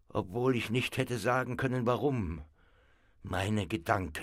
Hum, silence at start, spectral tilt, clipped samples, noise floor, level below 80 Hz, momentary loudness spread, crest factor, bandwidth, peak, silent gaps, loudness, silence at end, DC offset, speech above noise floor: none; 0.15 s; -6 dB/octave; under 0.1%; -64 dBFS; -54 dBFS; 8 LU; 20 dB; 16 kHz; -12 dBFS; none; -32 LUFS; 0 s; under 0.1%; 33 dB